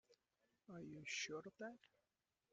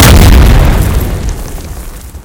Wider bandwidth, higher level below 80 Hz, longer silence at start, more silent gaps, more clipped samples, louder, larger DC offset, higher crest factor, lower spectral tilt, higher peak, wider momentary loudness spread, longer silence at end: second, 9.6 kHz vs over 20 kHz; second, -90 dBFS vs -8 dBFS; about the same, 0.1 s vs 0 s; neither; second, under 0.1% vs 20%; second, -51 LUFS vs -8 LUFS; neither; first, 22 dB vs 6 dB; second, -2.5 dB/octave vs -5 dB/octave; second, -34 dBFS vs 0 dBFS; second, 13 LU vs 21 LU; first, 0.65 s vs 0.05 s